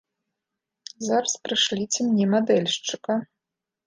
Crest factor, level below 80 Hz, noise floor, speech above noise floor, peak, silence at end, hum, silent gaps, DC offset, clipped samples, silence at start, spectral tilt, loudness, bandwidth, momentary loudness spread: 18 dB; -72 dBFS; -86 dBFS; 63 dB; -8 dBFS; 0.6 s; none; none; under 0.1%; under 0.1%; 1 s; -3.5 dB/octave; -23 LUFS; 9.8 kHz; 10 LU